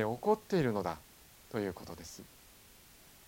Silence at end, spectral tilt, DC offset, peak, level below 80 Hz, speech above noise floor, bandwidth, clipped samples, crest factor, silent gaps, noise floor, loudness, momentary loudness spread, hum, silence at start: 1 s; -6 dB/octave; under 0.1%; -16 dBFS; -64 dBFS; 24 dB; 17 kHz; under 0.1%; 20 dB; none; -59 dBFS; -35 LUFS; 25 LU; none; 0 s